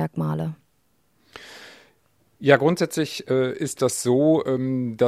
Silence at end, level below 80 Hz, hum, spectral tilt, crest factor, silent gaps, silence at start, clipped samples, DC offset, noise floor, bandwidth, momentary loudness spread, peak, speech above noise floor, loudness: 0 s; -64 dBFS; none; -5.5 dB/octave; 22 dB; none; 0 s; under 0.1%; under 0.1%; -67 dBFS; 14.5 kHz; 23 LU; 0 dBFS; 46 dB; -22 LUFS